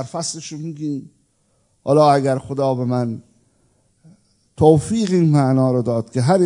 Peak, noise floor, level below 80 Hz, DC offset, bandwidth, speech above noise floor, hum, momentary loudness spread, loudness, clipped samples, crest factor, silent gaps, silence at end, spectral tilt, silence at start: 0 dBFS; -63 dBFS; -54 dBFS; under 0.1%; 11 kHz; 46 dB; none; 14 LU; -18 LUFS; under 0.1%; 18 dB; none; 0 s; -7 dB/octave; 0 s